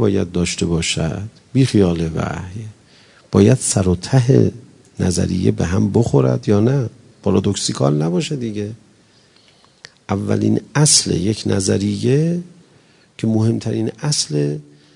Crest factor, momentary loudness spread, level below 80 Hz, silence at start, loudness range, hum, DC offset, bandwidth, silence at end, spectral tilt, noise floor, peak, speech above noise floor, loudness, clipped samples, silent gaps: 18 dB; 11 LU; -48 dBFS; 0 s; 4 LU; none; under 0.1%; 11 kHz; 0.35 s; -5.5 dB/octave; -52 dBFS; 0 dBFS; 35 dB; -17 LUFS; under 0.1%; none